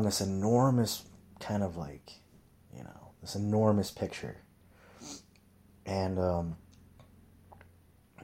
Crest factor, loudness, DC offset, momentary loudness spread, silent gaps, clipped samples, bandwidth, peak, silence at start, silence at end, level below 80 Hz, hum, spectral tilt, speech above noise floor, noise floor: 22 dB; -32 LUFS; under 0.1%; 23 LU; none; under 0.1%; 16.5 kHz; -12 dBFS; 0 s; 0 s; -60 dBFS; none; -6 dB/octave; 31 dB; -62 dBFS